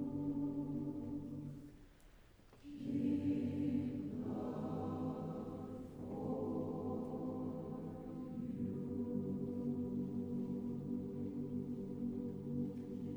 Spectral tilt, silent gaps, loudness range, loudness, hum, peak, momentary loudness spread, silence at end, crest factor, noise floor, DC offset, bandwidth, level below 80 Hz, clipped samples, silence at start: -10 dB/octave; none; 3 LU; -43 LUFS; none; -28 dBFS; 9 LU; 0 s; 14 dB; -63 dBFS; under 0.1%; over 20 kHz; -66 dBFS; under 0.1%; 0 s